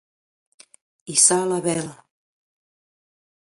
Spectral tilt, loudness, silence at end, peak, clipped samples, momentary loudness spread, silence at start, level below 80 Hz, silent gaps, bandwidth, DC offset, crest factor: -2.5 dB/octave; -18 LUFS; 1.65 s; -2 dBFS; under 0.1%; 13 LU; 1.05 s; -70 dBFS; none; 11.5 kHz; under 0.1%; 24 dB